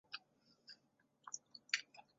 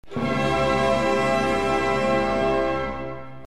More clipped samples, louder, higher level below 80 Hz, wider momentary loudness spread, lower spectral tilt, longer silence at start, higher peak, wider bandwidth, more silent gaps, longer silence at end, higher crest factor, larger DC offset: neither; second, -46 LUFS vs -22 LUFS; second, under -90 dBFS vs -42 dBFS; first, 20 LU vs 7 LU; second, 4 dB/octave vs -5.5 dB/octave; about the same, 0.1 s vs 0.1 s; second, -18 dBFS vs -10 dBFS; second, 7.6 kHz vs 13 kHz; neither; first, 0.15 s vs 0 s; first, 32 dB vs 12 dB; second, under 0.1% vs 1%